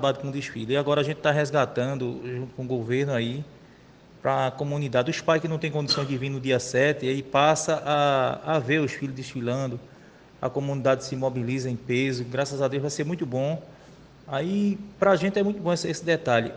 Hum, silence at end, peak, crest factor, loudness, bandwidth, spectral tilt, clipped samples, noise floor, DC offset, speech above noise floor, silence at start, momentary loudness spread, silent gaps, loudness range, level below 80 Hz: none; 0 s; -6 dBFS; 20 dB; -26 LUFS; 10 kHz; -5.5 dB/octave; under 0.1%; -51 dBFS; under 0.1%; 26 dB; 0 s; 9 LU; none; 4 LU; -60 dBFS